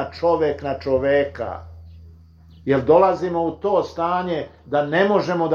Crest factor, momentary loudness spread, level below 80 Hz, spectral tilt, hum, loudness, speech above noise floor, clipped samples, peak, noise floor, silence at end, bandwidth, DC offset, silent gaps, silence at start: 18 dB; 12 LU; -48 dBFS; -7.5 dB/octave; none; -20 LUFS; 27 dB; under 0.1%; -2 dBFS; -47 dBFS; 0 s; 7 kHz; under 0.1%; none; 0 s